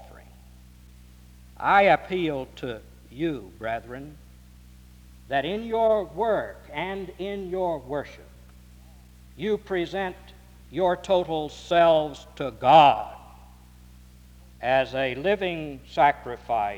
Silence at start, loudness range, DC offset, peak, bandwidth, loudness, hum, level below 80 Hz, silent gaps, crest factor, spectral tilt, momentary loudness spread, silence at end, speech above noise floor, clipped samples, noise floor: 0 s; 10 LU; under 0.1%; -4 dBFS; 19.5 kHz; -25 LUFS; none; -50 dBFS; none; 22 dB; -6 dB/octave; 16 LU; 0 s; 25 dB; under 0.1%; -49 dBFS